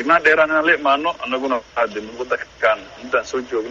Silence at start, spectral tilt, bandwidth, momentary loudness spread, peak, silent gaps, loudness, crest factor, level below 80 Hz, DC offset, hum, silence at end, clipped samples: 0 s; -3.5 dB/octave; 7.8 kHz; 11 LU; -2 dBFS; none; -19 LUFS; 18 dB; -54 dBFS; under 0.1%; none; 0 s; under 0.1%